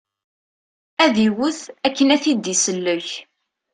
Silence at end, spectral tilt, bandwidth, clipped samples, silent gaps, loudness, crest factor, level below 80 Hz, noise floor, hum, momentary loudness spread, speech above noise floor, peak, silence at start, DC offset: 0.5 s; -3 dB/octave; 10.5 kHz; under 0.1%; none; -18 LUFS; 20 dB; -62 dBFS; under -90 dBFS; none; 12 LU; over 71 dB; -2 dBFS; 1 s; under 0.1%